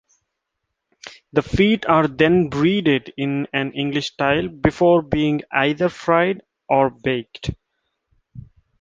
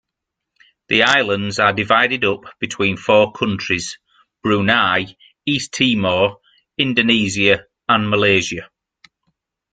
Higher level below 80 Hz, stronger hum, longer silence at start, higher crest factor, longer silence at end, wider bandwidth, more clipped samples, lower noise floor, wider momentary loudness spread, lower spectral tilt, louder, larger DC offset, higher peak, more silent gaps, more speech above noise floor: first, -44 dBFS vs -54 dBFS; neither; first, 1.05 s vs 0.9 s; about the same, 20 dB vs 18 dB; second, 0.4 s vs 1.05 s; second, 7.6 kHz vs 9.4 kHz; neither; about the same, -78 dBFS vs -81 dBFS; about the same, 9 LU vs 11 LU; first, -6.5 dB/octave vs -4 dB/octave; second, -19 LUFS vs -16 LUFS; neither; about the same, 0 dBFS vs 0 dBFS; neither; second, 60 dB vs 64 dB